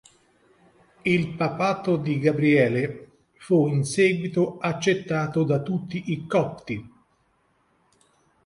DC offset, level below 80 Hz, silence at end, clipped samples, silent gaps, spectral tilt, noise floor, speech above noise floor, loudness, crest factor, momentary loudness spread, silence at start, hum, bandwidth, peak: under 0.1%; -62 dBFS; 1.6 s; under 0.1%; none; -6.5 dB/octave; -66 dBFS; 44 dB; -24 LUFS; 18 dB; 10 LU; 1.05 s; none; 11.5 kHz; -6 dBFS